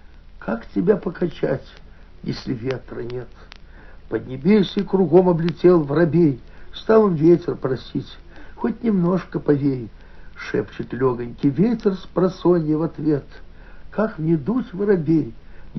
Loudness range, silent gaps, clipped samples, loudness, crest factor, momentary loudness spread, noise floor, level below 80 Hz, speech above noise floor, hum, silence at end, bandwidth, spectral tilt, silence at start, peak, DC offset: 8 LU; none; under 0.1%; -20 LUFS; 18 dB; 15 LU; -41 dBFS; -44 dBFS; 21 dB; none; 0 s; 6.2 kHz; -7.5 dB/octave; 0.05 s; -2 dBFS; under 0.1%